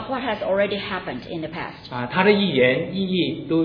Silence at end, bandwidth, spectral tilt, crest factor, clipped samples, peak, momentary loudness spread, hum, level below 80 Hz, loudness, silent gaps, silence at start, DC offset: 0 s; 5.4 kHz; -8.5 dB/octave; 20 dB; under 0.1%; -2 dBFS; 13 LU; none; -54 dBFS; -22 LUFS; none; 0 s; under 0.1%